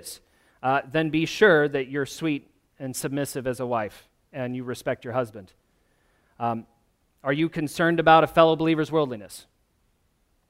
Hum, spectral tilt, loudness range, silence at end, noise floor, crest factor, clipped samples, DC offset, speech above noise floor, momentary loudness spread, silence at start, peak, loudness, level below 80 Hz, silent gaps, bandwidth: none; -5.5 dB/octave; 9 LU; 1.1 s; -68 dBFS; 22 dB; under 0.1%; under 0.1%; 44 dB; 17 LU; 0.05 s; -4 dBFS; -24 LUFS; -60 dBFS; none; 16 kHz